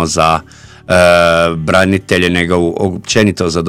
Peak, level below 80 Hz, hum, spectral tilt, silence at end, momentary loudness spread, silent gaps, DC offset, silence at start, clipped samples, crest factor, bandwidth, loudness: 0 dBFS; -36 dBFS; none; -4.5 dB/octave; 0 s; 6 LU; none; 0.3%; 0 s; 0.4%; 12 dB; 16.5 kHz; -11 LUFS